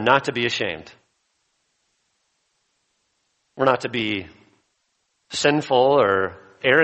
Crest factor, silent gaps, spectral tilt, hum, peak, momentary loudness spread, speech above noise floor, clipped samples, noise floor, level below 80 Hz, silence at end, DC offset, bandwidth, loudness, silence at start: 22 dB; none; -4 dB/octave; none; 0 dBFS; 12 LU; 51 dB; under 0.1%; -72 dBFS; -62 dBFS; 0 s; under 0.1%; 8.4 kHz; -21 LUFS; 0 s